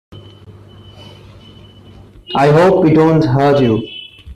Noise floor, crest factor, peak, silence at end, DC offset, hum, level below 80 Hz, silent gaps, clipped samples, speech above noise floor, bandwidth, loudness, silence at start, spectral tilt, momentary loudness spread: -39 dBFS; 12 dB; -2 dBFS; 0 s; under 0.1%; 50 Hz at -35 dBFS; -42 dBFS; none; under 0.1%; 29 dB; 11.5 kHz; -12 LUFS; 0.1 s; -8 dB/octave; 12 LU